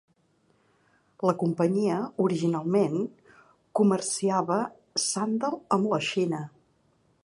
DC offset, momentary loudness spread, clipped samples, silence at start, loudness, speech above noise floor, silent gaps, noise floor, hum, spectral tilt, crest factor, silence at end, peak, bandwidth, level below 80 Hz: under 0.1%; 6 LU; under 0.1%; 1.2 s; -27 LUFS; 41 dB; none; -67 dBFS; none; -5 dB/octave; 20 dB; 0.75 s; -8 dBFS; 11.5 kHz; -74 dBFS